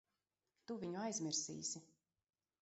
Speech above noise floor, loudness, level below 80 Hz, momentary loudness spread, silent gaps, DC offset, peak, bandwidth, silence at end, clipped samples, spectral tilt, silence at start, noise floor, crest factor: over 45 dB; -44 LUFS; -86 dBFS; 11 LU; none; under 0.1%; -28 dBFS; 8 kHz; 0.75 s; under 0.1%; -4 dB/octave; 0.7 s; under -90 dBFS; 20 dB